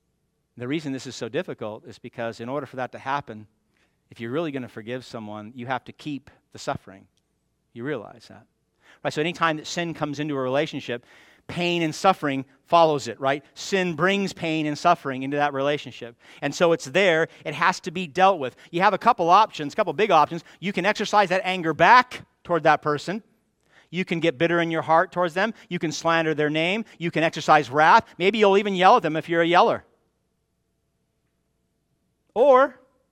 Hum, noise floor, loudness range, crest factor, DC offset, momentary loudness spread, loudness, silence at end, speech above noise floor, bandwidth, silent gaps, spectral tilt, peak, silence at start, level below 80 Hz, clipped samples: none; -73 dBFS; 13 LU; 22 dB; under 0.1%; 17 LU; -22 LUFS; 0.4 s; 50 dB; 15 kHz; none; -5 dB/octave; -2 dBFS; 0.55 s; -68 dBFS; under 0.1%